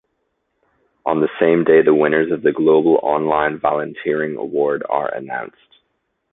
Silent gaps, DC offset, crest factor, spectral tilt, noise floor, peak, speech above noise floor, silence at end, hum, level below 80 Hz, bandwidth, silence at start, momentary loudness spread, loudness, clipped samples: none; under 0.1%; 16 dB; -11 dB/octave; -71 dBFS; -2 dBFS; 54 dB; 0.85 s; none; -58 dBFS; 4 kHz; 1.05 s; 12 LU; -17 LUFS; under 0.1%